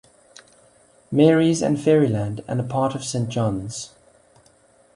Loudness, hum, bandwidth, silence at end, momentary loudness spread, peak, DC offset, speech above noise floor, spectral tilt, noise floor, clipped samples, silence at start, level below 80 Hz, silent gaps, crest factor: -21 LUFS; none; 11.5 kHz; 1.1 s; 13 LU; -4 dBFS; under 0.1%; 36 dB; -6.5 dB/octave; -56 dBFS; under 0.1%; 1.1 s; -54 dBFS; none; 18 dB